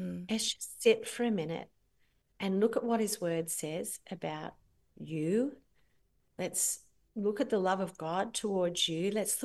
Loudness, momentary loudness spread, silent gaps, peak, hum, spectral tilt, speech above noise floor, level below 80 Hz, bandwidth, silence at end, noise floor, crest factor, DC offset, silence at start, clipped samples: -33 LUFS; 10 LU; none; -12 dBFS; none; -3.5 dB/octave; 40 dB; -72 dBFS; 13 kHz; 0 s; -73 dBFS; 22 dB; under 0.1%; 0 s; under 0.1%